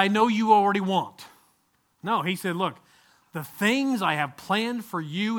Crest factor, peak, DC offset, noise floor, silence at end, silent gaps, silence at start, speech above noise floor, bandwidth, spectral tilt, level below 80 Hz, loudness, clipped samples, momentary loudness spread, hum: 22 dB; -4 dBFS; under 0.1%; -69 dBFS; 0 s; none; 0 s; 44 dB; 20 kHz; -5 dB/octave; -70 dBFS; -25 LUFS; under 0.1%; 17 LU; none